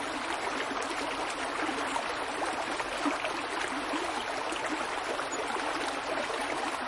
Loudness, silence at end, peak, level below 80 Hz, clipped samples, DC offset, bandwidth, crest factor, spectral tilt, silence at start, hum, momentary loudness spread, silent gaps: -32 LUFS; 0 s; -16 dBFS; -60 dBFS; under 0.1%; under 0.1%; 11.5 kHz; 16 dB; -2 dB/octave; 0 s; none; 2 LU; none